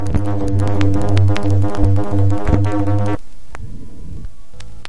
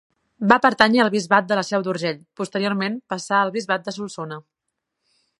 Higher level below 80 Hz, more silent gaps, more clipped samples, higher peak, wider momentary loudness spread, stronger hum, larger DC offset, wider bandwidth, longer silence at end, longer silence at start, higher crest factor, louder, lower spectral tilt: first, -28 dBFS vs -64 dBFS; neither; neither; about the same, 0 dBFS vs 0 dBFS; first, 20 LU vs 15 LU; neither; first, 20% vs under 0.1%; about the same, 11 kHz vs 11.5 kHz; second, 0 s vs 1 s; second, 0 s vs 0.4 s; second, 16 dB vs 22 dB; first, -17 LUFS vs -20 LUFS; first, -8 dB/octave vs -4.5 dB/octave